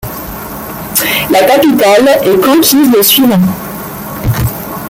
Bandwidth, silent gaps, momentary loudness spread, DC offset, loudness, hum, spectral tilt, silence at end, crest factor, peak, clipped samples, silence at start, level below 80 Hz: over 20 kHz; none; 15 LU; under 0.1%; -8 LUFS; none; -4 dB/octave; 0 s; 10 dB; 0 dBFS; under 0.1%; 0 s; -32 dBFS